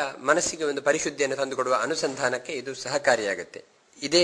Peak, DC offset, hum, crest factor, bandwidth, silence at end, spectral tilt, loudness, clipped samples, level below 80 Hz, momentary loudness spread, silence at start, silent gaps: -4 dBFS; under 0.1%; none; 22 dB; 11 kHz; 0 s; -2 dB/octave; -26 LUFS; under 0.1%; -64 dBFS; 10 LU; 0 s; none